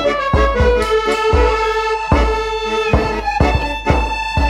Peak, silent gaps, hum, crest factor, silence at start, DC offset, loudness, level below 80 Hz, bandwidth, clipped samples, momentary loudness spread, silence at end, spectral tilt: -2 dBFS; none; none; 14 dB; 0 s; under 0.1%; -16 LUFS; -20 dBFS; 12 kHz; under 0.1%; 5 LU; 0 s; -6 dB/octave